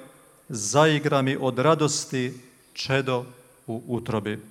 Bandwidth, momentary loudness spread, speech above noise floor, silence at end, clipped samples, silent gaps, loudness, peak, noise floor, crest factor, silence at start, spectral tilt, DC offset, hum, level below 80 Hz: 16 kHz; 16 LU; 26 dB; 0.05 s; under 0.1%; none; -24 LUFS; -4 dBFS; -50 dBFS; 20 dB; 0 s; -4.5 dB/octave; under 0.1%; none; -62 dBFS